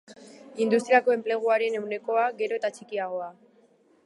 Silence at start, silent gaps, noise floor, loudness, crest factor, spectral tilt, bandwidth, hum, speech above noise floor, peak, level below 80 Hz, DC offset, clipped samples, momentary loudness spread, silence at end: 0.1 s; none; -61 dBFS; -26 LUFS; 18 dB; -4.5 dB/octave; 11.5 kHz; none; 36 dB; -8 dBFS; -86 dBFS; under 0.1%; under 0.1%; 12 LU; 0.75 s